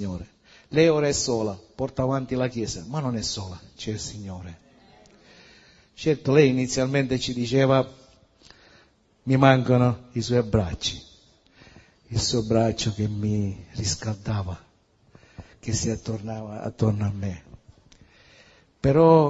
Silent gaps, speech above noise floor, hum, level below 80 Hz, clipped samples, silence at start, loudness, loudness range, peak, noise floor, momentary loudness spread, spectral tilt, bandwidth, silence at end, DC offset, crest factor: none; 36 dB; none; -48 dBFS; under 0.1%; 0 s; -24 LUFS; 7 LU; -2 dBFS; -60 dBFS; 16 LU; -5.5 dB/octave; 8 kHz; 0 s; under 0.1%; 24 dB